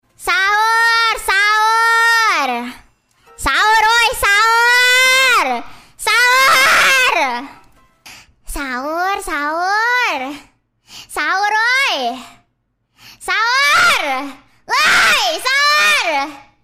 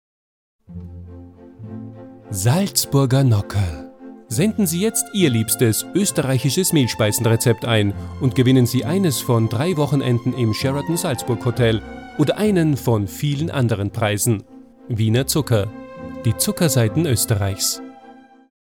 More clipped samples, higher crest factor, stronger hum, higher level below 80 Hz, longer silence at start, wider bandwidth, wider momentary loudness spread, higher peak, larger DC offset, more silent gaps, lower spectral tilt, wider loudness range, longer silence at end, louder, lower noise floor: neither; about the same, 14 dB vs 16 dB; neither; first, -42 dBFS vs -48 dBFS; second, 0.2 s vs 0.7 s; second, 16 kHz vs 19 kHz; second, 14 LU vs 17 LU; about the same, -2 dBFS vs -2 dBFS; second, under 0.1% vs 0.1%; neither; second, 0 dB/octave vs -5 dB/octave; first, 8 LU vs 3 LU; second, 0.25 s vs 0.5 s; first, -12 LUFS vs -19 LUFS; first, -66 dBFS vs -45 dBFS